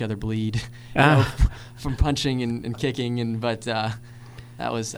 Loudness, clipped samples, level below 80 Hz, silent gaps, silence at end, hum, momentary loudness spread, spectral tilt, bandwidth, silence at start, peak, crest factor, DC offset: -24 LUFS; under 0.1%; -32 dBFS; none; 0 s; none; 15 LU; -5.5 dB/octave; over 20 kHz; 0 s; -2 dBFS; 22 dB; under 0.1%